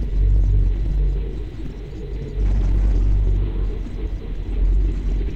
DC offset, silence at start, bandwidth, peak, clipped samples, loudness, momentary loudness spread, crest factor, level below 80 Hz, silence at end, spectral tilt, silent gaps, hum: under 0.1%; 0 s; 4.2 kHz; -8 dBFS; under 0.1%; -23 LUFS; 11 LU; 10 dB; -20 dBFS; 0 s; -9 dB/octave; none; none